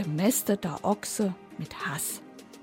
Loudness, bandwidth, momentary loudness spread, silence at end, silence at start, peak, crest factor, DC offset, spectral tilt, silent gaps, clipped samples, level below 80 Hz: -29 LUFS; 17 kHz; 14 LU; 0 s; 0 s; -12 dBFS; 16 dB; under 0.1%; -4.5 dB/octave; none; under 0.1%; -64 dBFS